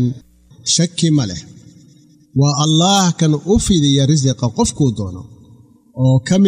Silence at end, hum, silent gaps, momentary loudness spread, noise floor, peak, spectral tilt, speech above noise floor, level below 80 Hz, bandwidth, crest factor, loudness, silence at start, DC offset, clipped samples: 0 s; none; none; 13 LU; -47 dBFS; -2 dBFS; -5 dB/octave; 33 dB; -36 dBFS; 13.5 kHz; 12 dB; -15 LUFS; 0 s; under 0.1%; under 0.1%